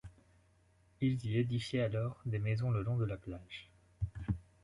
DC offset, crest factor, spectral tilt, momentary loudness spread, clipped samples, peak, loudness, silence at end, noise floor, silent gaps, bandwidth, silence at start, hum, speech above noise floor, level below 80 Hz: under 0.1%; 16 dB; -8 dB/octave; 11 LU; under 0.1%; -22 dBFS; -37 LUFS; 0.2 s; -69 dBFS; none; 11 kHz; 0.05 s; none; 34 dB; -54 dBFS